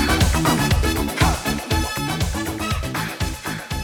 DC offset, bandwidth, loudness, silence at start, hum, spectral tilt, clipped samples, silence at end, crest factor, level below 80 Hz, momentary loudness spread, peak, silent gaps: under 0.1%; over 20 kHz; -21 LUFS; 0 s; none; -4.5 dB/octave; under 0.1%; 0 s; 18 dB; -28 dBFS; 8 LU; -2 dBFS; none